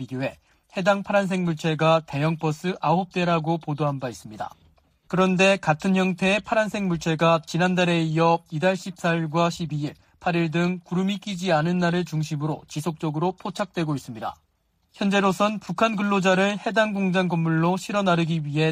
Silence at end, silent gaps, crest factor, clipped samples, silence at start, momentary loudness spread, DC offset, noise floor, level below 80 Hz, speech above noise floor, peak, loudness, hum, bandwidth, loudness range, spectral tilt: 0 s; none; 18 dB; under 0.1%; 0 s; 10 LU; under 0.1%; -68 dBFS; -60 dBFS; 45 dB; -6 dBFS; -23 LUFS; none; 15 kHz; 4 LU; -6 dB/octave